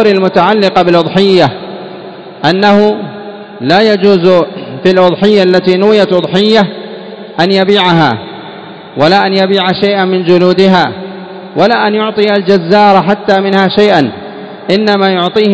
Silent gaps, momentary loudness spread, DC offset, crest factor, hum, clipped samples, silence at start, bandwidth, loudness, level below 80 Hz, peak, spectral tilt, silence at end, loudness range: none; 17 LU; 0.3%; 8 dB; none; 2%; 0 s; 8 kHz; -8 LUFS; -50 dBFS; 0 dBFS; -6.5 dB/octave; 0 s; 2 LU